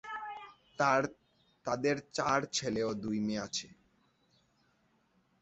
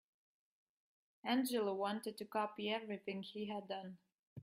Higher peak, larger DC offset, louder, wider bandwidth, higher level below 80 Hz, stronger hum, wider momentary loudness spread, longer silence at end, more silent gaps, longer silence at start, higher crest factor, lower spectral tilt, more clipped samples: first, -14 dBFS vs -22 dBFS; neither; first, -34 LUFS vs -42 LUFS; second, 8 kHz vs 15.5 kHz; first, -68 dBFS vs -88 dBFS; neither; first, 15 LU vs 11 LU; first, 1.7 s vs 0 s; second, none vs 4.19-4.36 s; second, 0.05 s vs 1.25 s; about the same, 22 dB vs 22 dB; about the same, -3.5 dB/octave vs -4.5 dB/octave; neither